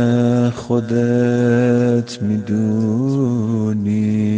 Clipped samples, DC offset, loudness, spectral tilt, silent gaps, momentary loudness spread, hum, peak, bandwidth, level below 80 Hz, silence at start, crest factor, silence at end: under 0.1%; under 0.1%; -17 LUFS; -8 dB/octave; none; 4 LU; none; -4 dBFS; 9 kHz; -54 dBFS; 0 s; 12 dB; 0 s